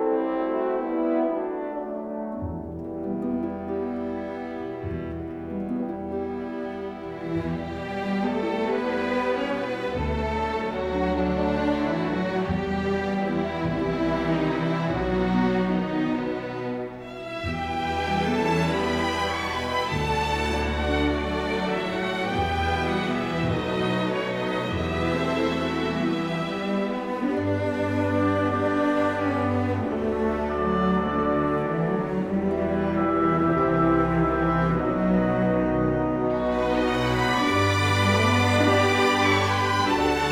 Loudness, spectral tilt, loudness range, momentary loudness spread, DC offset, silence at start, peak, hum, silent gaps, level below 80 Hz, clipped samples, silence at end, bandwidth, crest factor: -25 LUFS; -6 dB/octave; 8 LU; 10 LU; under 0.1%; 0 s; -8 dBFS; none; none; -42 dBFS; under 0.1%; 0 s; 16 kHz; 16 dB